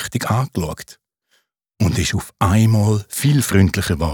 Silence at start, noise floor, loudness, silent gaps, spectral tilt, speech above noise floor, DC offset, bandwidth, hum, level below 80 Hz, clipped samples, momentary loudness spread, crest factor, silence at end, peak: 0 s; -65 dBFS; -18 LUFS; none; -5.5 dB/octave; 48 dB; under 0.1%; 19 kHz; none; -38 dBFS; under 0.1%; 9 LU; 16 dB; 0 s; -2 dBFS